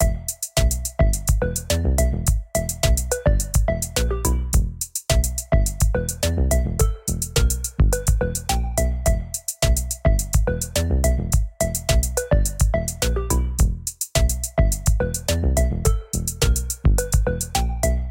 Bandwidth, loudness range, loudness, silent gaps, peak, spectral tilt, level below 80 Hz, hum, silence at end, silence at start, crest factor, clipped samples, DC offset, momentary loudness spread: 17 kHz; 1 LU; -22 LUFS; none; -6 dBFS; -4.5 dB/octave; -22 dBFS; none; 0 s; 0 s; 14 dB; under 0.1%; under 0.1%; 3 LU